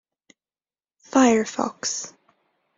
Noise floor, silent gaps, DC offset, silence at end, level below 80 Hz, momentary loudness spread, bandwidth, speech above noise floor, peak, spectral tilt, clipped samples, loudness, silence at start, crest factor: under -90 dBFS; none; under 0.1%; 0.7 s; -66 dBFS; 12 LU; 7.8 kHz; over 69 dB; -4 dBFS; -3 dB/octave; under 0.1%; -22 LUFS; 1.15 s; 20 dB